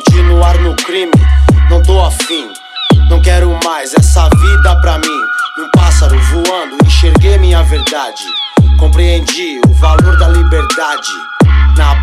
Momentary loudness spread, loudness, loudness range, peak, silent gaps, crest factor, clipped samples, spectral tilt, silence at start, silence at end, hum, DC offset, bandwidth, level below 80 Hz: 7 LU; -9 LUFS; 0 LU; 0 dBFS; none; 8 dB; under 0.1%; -5.5 dB/octave; 0 s; 0 s; none; under 0.1%; 13 kHz; -10 dBFS